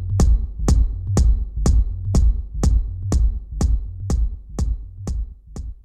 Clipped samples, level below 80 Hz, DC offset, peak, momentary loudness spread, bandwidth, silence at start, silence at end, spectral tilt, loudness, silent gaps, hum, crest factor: under 0.1%; -20 dBFS; under 0.1%; -6 dBFS; 10 LU; 9.6 kHz; 0 s; 0.1 s; -7 dB/octave; -22 LUFS; none; none; 14 dB